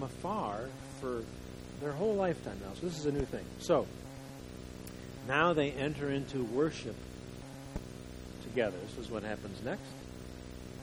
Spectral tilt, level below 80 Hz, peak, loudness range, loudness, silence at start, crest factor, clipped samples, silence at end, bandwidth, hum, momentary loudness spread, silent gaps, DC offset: -5.5 dB/octave; -54 dBFS; -14 dBFS; 6 LU; -36 LUFS; 0 s; 22 dB; under 0.1%; 0 s; over 20 kHz; none; 15 LU; none; under 0.1%